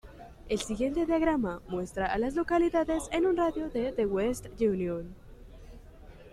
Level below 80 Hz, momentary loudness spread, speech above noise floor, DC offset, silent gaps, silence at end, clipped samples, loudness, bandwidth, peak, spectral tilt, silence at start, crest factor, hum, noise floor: -48 dBFS; 9 LU; 21 dB; under 0.1%; none; 0.05 s; under 0.1%; -30 LUFS; 13 kHz; -14 dBFS; -5.5 dB/octave; 0.05 s; 16 dB; none; -50 dBFS